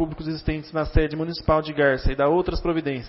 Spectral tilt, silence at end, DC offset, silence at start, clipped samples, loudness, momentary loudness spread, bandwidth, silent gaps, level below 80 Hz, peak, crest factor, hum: -10.5 dB/octave; 0 s; under 0.1%; 0 s; under 0.1%; -23 LUFS; 7 LU; 5.8 kHz; none; -30 dBFS; -4 dBFS; 18 dB; none